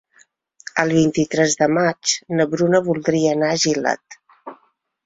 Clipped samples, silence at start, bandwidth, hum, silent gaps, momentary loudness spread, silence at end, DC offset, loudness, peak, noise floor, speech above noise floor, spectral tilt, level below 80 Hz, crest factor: under 0.1%; 0.75 s; 8 kHz; none; none; 7 LU; 0.5 s; under 0.1%; -18 LUFS; -2 dBFS; -61 dBFS; 43 dB; -4 dB/octave; -58 dBFS; 18 dB